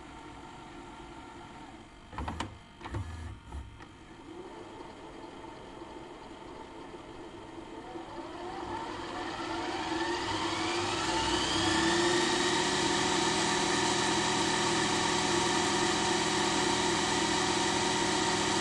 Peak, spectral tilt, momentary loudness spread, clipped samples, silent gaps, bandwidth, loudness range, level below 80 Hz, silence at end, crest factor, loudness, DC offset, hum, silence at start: -16 dBFS; -2.5 dB/octave; 19 LU; under 0.1%; none; 11.5 kHz; 18 LU; -54 dBFS; 0 s; 16 dB; -29 LUFS; under 0.1%; none; 0 s